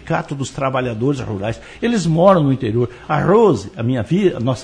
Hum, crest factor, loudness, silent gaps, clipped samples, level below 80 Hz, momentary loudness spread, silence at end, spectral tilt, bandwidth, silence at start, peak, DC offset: none; 16 dB; -17 LUFS; none; under 0.1%; -44 dBFS; 10 LU; 0 s; -7 dB/octave; 10 kHz; 0.05 s; 0 dBFS; under 0.1%